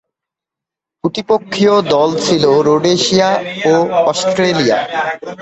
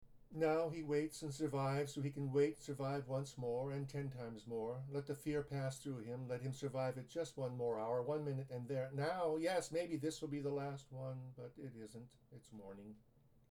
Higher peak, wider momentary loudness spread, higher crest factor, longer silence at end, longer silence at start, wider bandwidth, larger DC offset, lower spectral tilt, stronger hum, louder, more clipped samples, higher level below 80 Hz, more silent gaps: first, 0 dBFS vs -26 dBFS; second, 8 LU vs 15 LU; about the same, 14 dB vs 18 dB; second, 0 s vs 0.5 s; first, 1.05 s vs 0 s; second, 8.4 kHz vs 15.5 kHz; neither; second, -4.5 dB/octave vs -6.5 dB/octave; neither; first, -13 LUFS vs -42 LUFS; neither; first, -54 dBFS vs -72 dBFS; neither